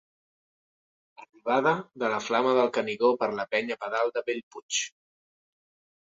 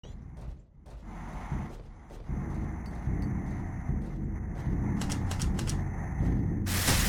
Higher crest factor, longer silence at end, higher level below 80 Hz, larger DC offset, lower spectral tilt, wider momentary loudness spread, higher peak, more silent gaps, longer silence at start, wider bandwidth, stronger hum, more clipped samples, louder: about the same, 20 dB vs 18 dB; first, 1.15 s vs 0 s; second, -74 dBFS vs -38 dBFS; neither; second, -3 dB/octave vs -4.5 dB/octave; second, 8 LU vs 16 LU; first, -10 dBFS vs -14 dBFS; first, 4.43-4.51 s, 4.62-4.69 s vs none; first, 1.2 s vs 0.05 s; second, 7.8 kHz vs 17.5 kHz; neither; neither; first, -27 LUFS vs -33 LUFS